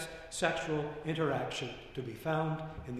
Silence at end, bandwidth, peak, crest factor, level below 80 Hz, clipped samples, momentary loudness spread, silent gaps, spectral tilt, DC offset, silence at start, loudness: 0 s; 14.5 kHz; -14 dBFS; 22 dB; -58 dBFS; under 0.1%; 8 LU; none; -5 dB/octave; under 0.1%; 0 s; -36 LUFS